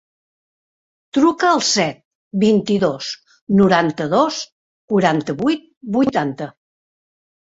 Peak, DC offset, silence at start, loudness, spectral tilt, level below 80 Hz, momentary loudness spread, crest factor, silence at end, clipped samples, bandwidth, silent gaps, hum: -2 dBFS; under 0.1%; 1.15 s; -18 LUFS; -5 dB/octave; -58 dBFS; 13 LU; 18 dB; 0.95 s; under 0.1%; 8 kHz; 2.05-2.31 s, 3.41-3.47 s, 4.52-4.88 s, 5.77-5.81 s; none